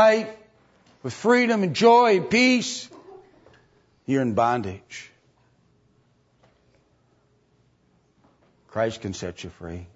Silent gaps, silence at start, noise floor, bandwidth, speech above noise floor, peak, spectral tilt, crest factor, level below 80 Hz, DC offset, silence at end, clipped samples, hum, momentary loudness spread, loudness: none; 0 s; -64 dBFS; 8 kHz; 42 dB; -4 dBFS; -4.5 dB/octave; 20 dB; -62 dBFS; under 0.1%; 0.1 s; under 0.1%; none; 21 LU; -21 LUFS